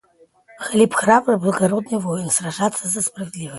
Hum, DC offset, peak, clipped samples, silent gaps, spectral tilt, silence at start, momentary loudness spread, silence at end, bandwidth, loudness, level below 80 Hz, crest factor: none; under 0.1%; 0 dBFS; under 0.1%; none; -4.5 dB/octave; 0.6 s; 8 LU; 0 s; 12 kHz; -19 LUFS; -60 dBFS; 20 dB